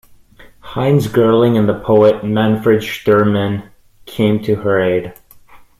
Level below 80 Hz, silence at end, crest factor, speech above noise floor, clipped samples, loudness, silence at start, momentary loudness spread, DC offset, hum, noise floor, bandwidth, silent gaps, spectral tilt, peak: -46 dBFS; 0.2 s; 14 dB; 30 dB; under 0.1%; -14 LUFS; 0.65 s; 10 LU; under 0.1%; none; -43 dBFS; 15.5 kHz; none; -7.5 dB/octave; -2 dBFS